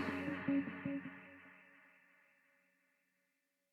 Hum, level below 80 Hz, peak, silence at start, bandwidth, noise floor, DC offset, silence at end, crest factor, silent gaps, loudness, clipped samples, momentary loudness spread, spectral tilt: none; -84 dBFS; -26 dBFS; 0 s; 7.2 kHz; -85 dBFS; under 0.1%; 1.85 s; 20 dB; none; -41 LUFS; under 0.1%; 23 LU; -7.5 dB/octave